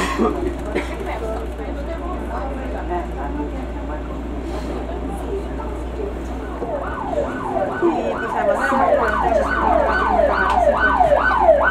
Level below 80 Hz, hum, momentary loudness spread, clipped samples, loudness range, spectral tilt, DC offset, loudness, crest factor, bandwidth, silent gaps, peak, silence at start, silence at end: -30 dBFS; none; 12 LU; under 0.1%; 10 LU; -6.5 dB/octave; under 0.1%; -20 LUFS; 18 dB; 13 kHz; none; -2 dBFS; 0 s; 0 s